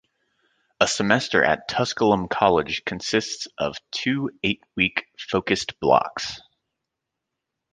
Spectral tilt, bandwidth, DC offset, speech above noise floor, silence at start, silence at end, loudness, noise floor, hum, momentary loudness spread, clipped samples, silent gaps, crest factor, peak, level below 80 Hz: -4 dB/octave; 10 kHz; under 0.1%; 60 dB; 0.8 s; 1.35 s; -23 LUFS; -83 dBFS; none; 9 LU; under 0.1%; none; 22 dB; -2 dBFS; -54 dBFS